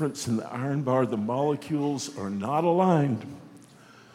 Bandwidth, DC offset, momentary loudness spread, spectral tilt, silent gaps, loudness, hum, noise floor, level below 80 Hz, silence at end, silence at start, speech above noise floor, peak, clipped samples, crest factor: 15.5 kHz; under 0.1%; 10 LU; -6.5 dB/octave; none; -27 LUFS; none; -52 dBFS; -72 dBFS; 0.5 s; 0 s; 26 dB; -10 dBFS; under 0.1%; 18 dB